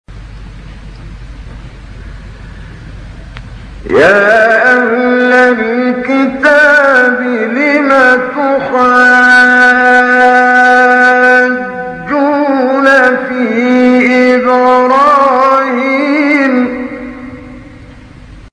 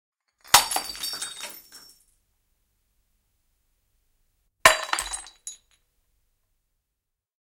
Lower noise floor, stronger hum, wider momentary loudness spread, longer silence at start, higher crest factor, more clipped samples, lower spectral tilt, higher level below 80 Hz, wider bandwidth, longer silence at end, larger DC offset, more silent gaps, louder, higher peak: second, -32 dBFS vs -83 dBFS; neither; second, 8 LU vs 22 LU; second, 0.1 s vs 0.5 s; second, 10 dB vs 30 dB; first, 1% vs under 0.1%; first, -5 dB/octave vs 1 dB/octave; first, -36 dBFS vs -56 dBFS; second, 11 kHz vs 17 kHz; second, 0.1 s vs 1.9 s; neither; neither; first, -7 LUFS vs -22 LUFS; about the same, 0 dBFS vs 0 dBFS